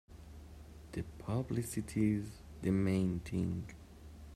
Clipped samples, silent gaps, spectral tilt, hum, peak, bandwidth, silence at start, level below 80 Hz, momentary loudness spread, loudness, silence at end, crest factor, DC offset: under 0.1%; none; -7 dB/octave; none; -22 dBFS; 14.5 kHz; 0.1 s; -56 dBFS; 21 LU; -37 LUFS; 0 s; 16 dB; under 0.1%